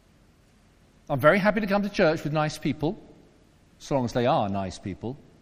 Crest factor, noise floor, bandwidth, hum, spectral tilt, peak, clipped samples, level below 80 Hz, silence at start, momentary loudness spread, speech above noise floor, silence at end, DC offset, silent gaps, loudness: 22 dB; -59 dBFS; 15.5 kHz; none; -6.5 dB/octave; -4 dBFS; under 0.1%; -50 dBFS; 1.1 s; 15 LU; 34 dB; 0.2 s; under 0.1%; none; -25 LUFS